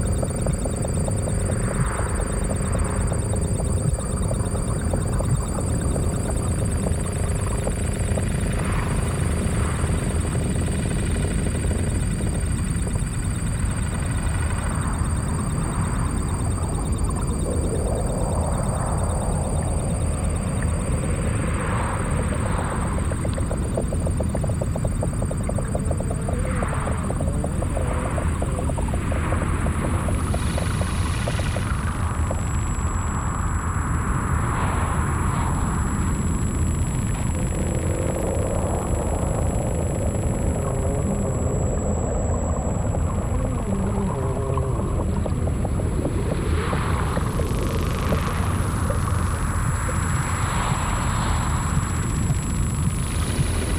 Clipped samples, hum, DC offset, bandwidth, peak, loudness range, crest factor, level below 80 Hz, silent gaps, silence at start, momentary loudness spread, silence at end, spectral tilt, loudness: under 0.1%; none; under 0.1%; 17 kHz; -8 dBFS; 1 LU; 14 dB; -28 dBFS; none; 0 s; 2 LU; 0 s; -6 dB/octave; -24 LUFS